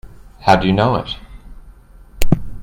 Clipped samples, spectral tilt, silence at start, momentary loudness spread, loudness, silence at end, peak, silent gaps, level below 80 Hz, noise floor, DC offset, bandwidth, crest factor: under 0.1%; -6 dB/octave; 0.05 s; 15 LU; -17 LUFS; 0 s; 0 dBFS; none; -28 dBFS; -41 dBFS; under 0.1%; 16.5 kHz; 16 dB